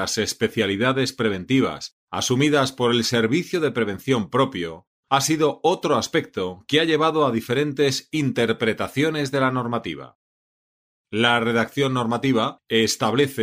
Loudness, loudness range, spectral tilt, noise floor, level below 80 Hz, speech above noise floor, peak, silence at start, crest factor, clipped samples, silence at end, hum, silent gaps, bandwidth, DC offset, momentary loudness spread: -21 LUFS; 2 LU; -4.5 dB/octave; under -90 dBFS; -60 dBFS; over 69 dB; -4 dBFS; 0 s; 18 dB; under 0.1%; 0 s; none; 1.92-2.07 s, 4.87-5.03 s, 10.15-11.05 s; 16 kHz; under 0.1%; 7 LU